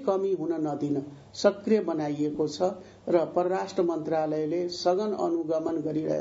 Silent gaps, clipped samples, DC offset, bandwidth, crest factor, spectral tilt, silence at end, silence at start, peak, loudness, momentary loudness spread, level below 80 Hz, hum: none; under 0.1%; under 0.1%; 7.8 kHz; 20 dB; -6 dB/octave; 0 s; 0 s; -8 dBFS; -28 LUFS; 4 LU; -68 dBFS; none